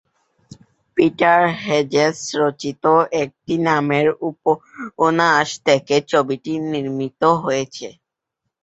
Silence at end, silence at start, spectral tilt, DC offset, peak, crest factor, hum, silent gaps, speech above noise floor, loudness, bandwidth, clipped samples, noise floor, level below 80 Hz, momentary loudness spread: 0.7 s; 0.95 s; -5 dB/octave; under 0.1%; 0 dBFS; 18 dB; none; none; 61 dB; -18 LUFS; 8.2 kHz; under 0.1%; -79 dBFS; -60 dBFS; 9 LU